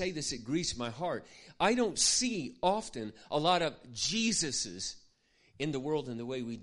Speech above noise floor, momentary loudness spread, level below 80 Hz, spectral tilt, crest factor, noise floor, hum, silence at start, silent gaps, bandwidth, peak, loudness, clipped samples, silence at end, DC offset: 35 dB; 12 LU; -60 dBFS; -3 dB/octave; 20 dB; -68 dBFS; none; 0 s; none; 11.5 kHz; -14 dBFS; -32 LUFS; under 0.1%; 0 s; under 0.1%